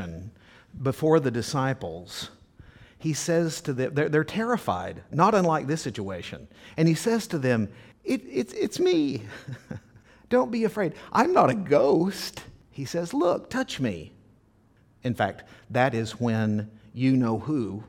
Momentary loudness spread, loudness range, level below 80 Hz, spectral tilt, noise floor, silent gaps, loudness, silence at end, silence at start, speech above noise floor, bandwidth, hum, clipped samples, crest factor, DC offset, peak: 17 LU; 4 LU; -58 dBFS; -6 dB/octave; -60 dBFS; none; -26 LUFS; 0.05 s; 0 s; 35 dB; 17.5 kHz; none; under 0.1%; 20 dB; under 0.1%; -6 dBFS